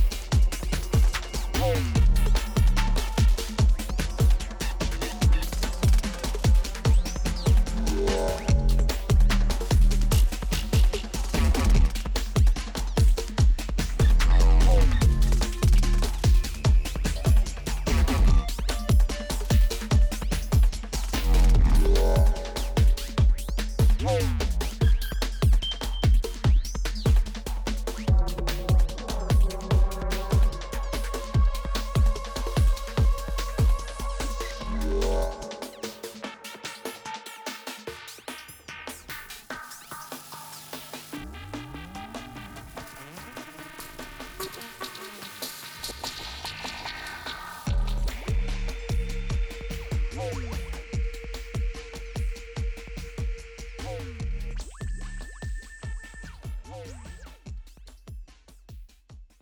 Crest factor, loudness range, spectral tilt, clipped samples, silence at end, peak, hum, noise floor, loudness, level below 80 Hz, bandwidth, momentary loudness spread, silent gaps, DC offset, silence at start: 12 dB; 15 LU; -5.5 dB/octave; under 0.1%; 0.2 s; -12 dBFS; none; -49 dBFS; -27 LUFS; -24 dBFS; over 20 kHz; 16 LU; none; under 0.1%; 0 s